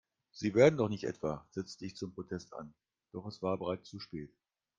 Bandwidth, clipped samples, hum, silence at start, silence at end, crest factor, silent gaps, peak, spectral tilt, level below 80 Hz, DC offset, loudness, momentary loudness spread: 7.6 kHz; under 0.1%; none; 0.35 s; 0.5 s; 24 dB; none; -12 dBFS; -6.5 dB/octave; -68 dBFS; under 0.1%; -35 LUFS; 22 LU